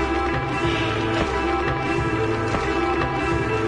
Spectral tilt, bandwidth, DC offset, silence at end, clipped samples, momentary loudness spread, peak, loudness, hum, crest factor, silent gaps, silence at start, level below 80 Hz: -6 dB/octave; 10.5 kHz; under 0.1%; 0 s; under 0.1%; 1 LU; -8 dBFS; -22 LUFS; none; 14 dB; none; 0 s; -34 dBFS